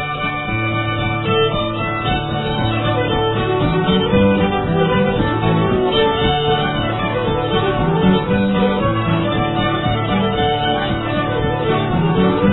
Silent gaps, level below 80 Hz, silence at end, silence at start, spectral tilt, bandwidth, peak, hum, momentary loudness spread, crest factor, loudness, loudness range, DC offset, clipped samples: none; -32 dBFS; 0 s; 0 s; -10 dB/octave; 4.1 kHz; -2 dBFS; none; 4 LU; 14 dB; -17 LUFS; 2 LU; under 0.1%; under 0.1%